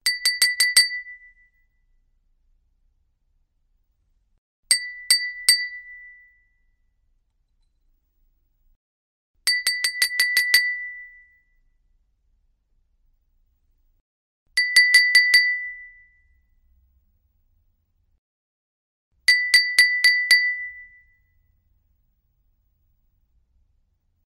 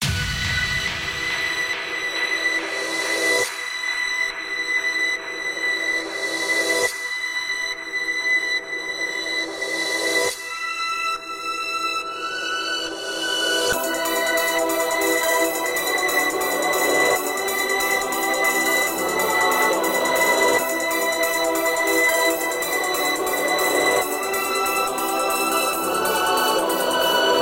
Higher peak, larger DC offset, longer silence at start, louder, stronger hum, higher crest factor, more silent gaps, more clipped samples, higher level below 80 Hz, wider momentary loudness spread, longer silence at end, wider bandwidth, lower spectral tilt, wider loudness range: first, -2 dBFS vs -6 dBFS; neither; about the same, 0.05 s vs 0 s; first, -17 LUFS vs -21 LUFS; neither; first, 24 dB vs 16 dB; first, 4.38-4.63 s, 8.76-9.34 s, 14.01-14.46 s, 18.18-19.11 s vs none; neither; second, -66 dBFS vs -48 dBFS; first, 17 LU vs 6 LU; first, 3.45 s vs 0 s; about the same, 16 kHz vs 17 kHz; second, 5 dB/octave vs -1.5 dB/octave; first, 11 LU vs 4 LU